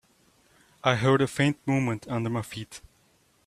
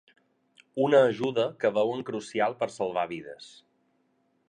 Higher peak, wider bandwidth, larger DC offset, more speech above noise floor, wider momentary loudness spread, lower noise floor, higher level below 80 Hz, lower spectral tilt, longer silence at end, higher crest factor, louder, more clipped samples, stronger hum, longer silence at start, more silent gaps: first, -4 dBFS vs -10 dBFS; first, 14 kHz vs 9.8 kHz; neither; second, 39 dB vs 44 dB; about the same, 16 LU vs 18 LU; second, -65 dBFS vs -71 dBFS; first, -60 dBFS vs -74 dBFS; about the same, -6 dB/octave vs -5.5 dB/octave; second, 0.7 s vs 1 s; about the same, 24 dB vs 20 dB; about the same, -26 LUFS vs -27 LUFS; neither; neither; about the same, 0.85 s vs 0.75 s; neither